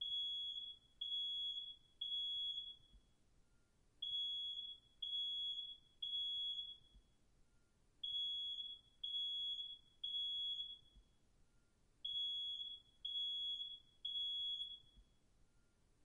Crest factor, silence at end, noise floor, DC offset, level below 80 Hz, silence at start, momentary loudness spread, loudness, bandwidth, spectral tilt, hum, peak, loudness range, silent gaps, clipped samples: 12 dB; 1 s; -74 dBFS; under 0.1%; -76 dBFS; 0 s; 10 LU; -43 LUFS; 10.5 kHz; -0.5 dB/octave; none; -36 dBFS; 2 LU; none; under 0.1%